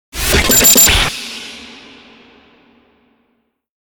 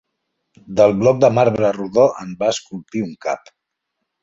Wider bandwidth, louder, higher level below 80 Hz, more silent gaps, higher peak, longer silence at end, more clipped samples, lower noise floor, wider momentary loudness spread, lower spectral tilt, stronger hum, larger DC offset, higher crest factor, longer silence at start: first, over 20 kHz vs 8 kHz; first, -8 LUFS vs -17 LUFS; first, -28 dBFS vs -54 dBFS; neither; about the same, 0 dBFS vs -2 dBFS; first, 2.2 s vs 0.85 s; neither; second, -64 dBFS vs -77 dBFS; first, 23 LU vs 12 LU; second, -1.5 dB/octave vs -6 dB/octave; neither; neither; about the same, 16 dB vs 18 dB; second, 0.15 s vs 0.7 s